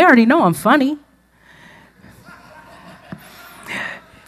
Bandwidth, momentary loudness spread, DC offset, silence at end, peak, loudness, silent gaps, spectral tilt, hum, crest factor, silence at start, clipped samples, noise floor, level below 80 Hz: 14.5 kHz; 26 LU; under 0.1%; 0.3 s; 0 dBFS; -15 LUFS; none; -5.5 dB/octave; none; 18 dB; 0 s; under 0.1%; -52 dBFS; -58 dBFS